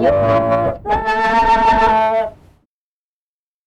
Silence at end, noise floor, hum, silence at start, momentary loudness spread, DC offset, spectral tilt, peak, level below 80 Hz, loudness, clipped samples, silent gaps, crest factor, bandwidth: 1.35 s; under -90 dBFS; none; 0 s; 7 LU; under 0.1%; -6.5 dB/octave; -4 dBFS; -34 dBFS; -14 LUFS; under 0.1%; none; 12 dB; 9.6 kHz